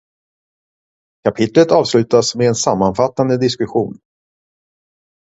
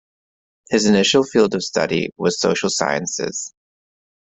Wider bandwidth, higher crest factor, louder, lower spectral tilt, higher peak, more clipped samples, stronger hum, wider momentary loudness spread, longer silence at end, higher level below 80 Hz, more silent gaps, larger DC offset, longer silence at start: about the same, 8 kHz vs 8.4 kHz; about the same, 16 dB vs 20 dB; first, -15 LUFS vs -18 LUFS; first, -5 dB/octave vs -3.5 dB/octave; about the same, 0 dBFS vs 0 dBFS; neither; neither; about the same, 9 LU vs 9 LU; first, 1.3 s vs 0.8 s; first, -50 dBFS vs -56 dBFS; neither; neither; first, 1.25 s vs 0.7 s